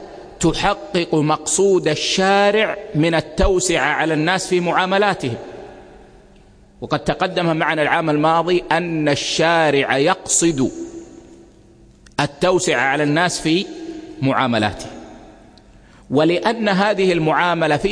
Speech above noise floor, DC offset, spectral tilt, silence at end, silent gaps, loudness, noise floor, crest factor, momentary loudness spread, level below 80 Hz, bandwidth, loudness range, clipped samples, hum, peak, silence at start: 30 dB; under 0.1%; -4 dB/octave; 0 s; none; -17 LUFS; -47 dBFS; 18 dB; 11 LU; -38 dBFS; 10.5 kHz; 5 LU; under 0.1%; none; -2 dBFS; 0 s